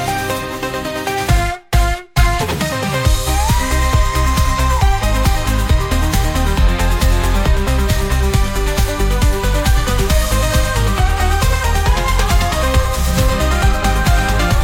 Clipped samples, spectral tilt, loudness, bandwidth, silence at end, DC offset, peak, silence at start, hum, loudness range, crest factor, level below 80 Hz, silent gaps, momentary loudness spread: under 0.1%; -4.5 dB/octave; -16 LUFS; 17 kHz; 0 s; under 0.1%; 0 dBFS; 0 s; none; 1 LU; 12 dB; -16 dBFS; none; 3 LU